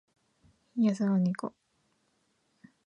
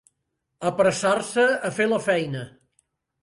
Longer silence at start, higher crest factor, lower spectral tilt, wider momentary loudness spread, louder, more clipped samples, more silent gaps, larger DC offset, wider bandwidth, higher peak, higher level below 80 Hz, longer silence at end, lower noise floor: first, 0.75 s vs 0.6 s; about the same, 18 dB vs 18 dB; first, -8 dB/octave vs -4.5 dB/octave; about the same, 13 LU vs 11 LU; second, -30 LUFS vs -23 LUFS; neither; neither; neither; second, 10 kHz vs 11.5 kHz; second, -16 dBFS vs -8 dBFS; second, -78 dBFS vs -64 dBFS; first, 1.4 s vs 0.75 s; second, -74 dBFS vs -78 dBFS